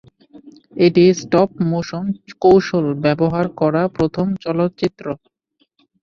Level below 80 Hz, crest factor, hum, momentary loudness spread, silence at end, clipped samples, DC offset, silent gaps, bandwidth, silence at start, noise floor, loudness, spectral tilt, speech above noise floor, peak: -50 dBFS; 16 dB; none; 12 LU; 0.85 s; under 0.1%; under 0.1%; none; 7 kHz; 0.35 s; -65 dBFS; -17 LUFS; -7 dB/octave; 49 dB; -2 dBFS